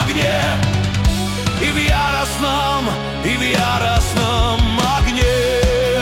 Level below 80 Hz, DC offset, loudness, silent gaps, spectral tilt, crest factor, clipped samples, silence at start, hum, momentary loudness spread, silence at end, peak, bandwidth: -24 dBFS; under 0.1%; -17 LUFS; none; -4.5 dB/octave; 12 dB; under 0.1%; 0 s; none; 3 LU; 0 s; -4 dBFS; 16.5 kHz